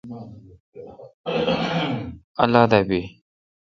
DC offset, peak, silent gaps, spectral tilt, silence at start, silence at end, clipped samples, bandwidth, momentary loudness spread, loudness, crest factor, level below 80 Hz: under 0.1%; 0 dBFS; 0.60-0.72 s, 1.14-1.24 s, 2.24-2.35 s; -7 dB/octave; 0.05 s; 0.7 s; under 0.1%; 7.4 kHz; 25 LU; -21 LUFS; 24 dB; -50 dBFS